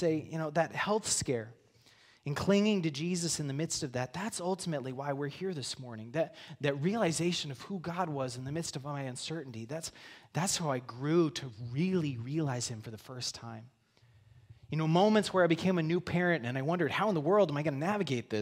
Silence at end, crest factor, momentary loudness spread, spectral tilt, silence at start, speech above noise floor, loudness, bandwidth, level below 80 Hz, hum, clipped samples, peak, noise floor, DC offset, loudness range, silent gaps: 0 s; 20 dB; 12 LU; -5 dB/octave; 0 s; 32 dB; -33 LUFS; 16 kHz; -68 dBFS; none; under 0.1%; -14 dBFS; -64 dBFS; under 0.1%; 7 LU; none